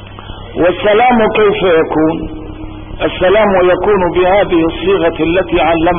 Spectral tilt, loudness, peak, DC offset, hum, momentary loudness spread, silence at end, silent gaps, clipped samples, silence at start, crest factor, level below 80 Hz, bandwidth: -11.5 dB/octave; -11 LUFS; -2 dBFS; 0.8%; none; 17 LU; 0 s; none; under 0.1%; 0 s; 10 dB; -30 dBFS; 3.7 kHz